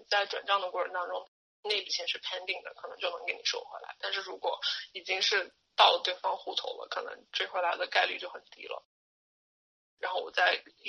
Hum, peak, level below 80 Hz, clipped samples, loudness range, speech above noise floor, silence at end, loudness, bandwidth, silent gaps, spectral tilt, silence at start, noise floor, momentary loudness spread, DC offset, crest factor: none; -8 dBFS; -86 dBFS; under 0.1%; 5 LU; over 57 dB; 0 s; -31 LUFS; 9.6 kHz; 1.28-1.63 s, 8.85-9.97 s; 1 dB/octave; 0 s; under -90 dBFS; 13 LU; under 0.1%; 26 dB